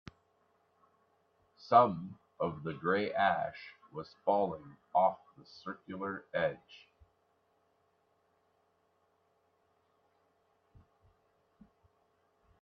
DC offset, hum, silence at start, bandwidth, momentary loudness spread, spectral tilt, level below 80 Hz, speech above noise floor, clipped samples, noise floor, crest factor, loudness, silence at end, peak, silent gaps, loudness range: under 0.1%; none; 1.65 s; 6.4 kHz; 21 LU; -7.5 dB/octave; -76 dBFS; 42 dB; under 0.1%; -75 dBFS; 28 dB; -33 LUFS; 5.85 s; -10 dBFS; none; 10 LU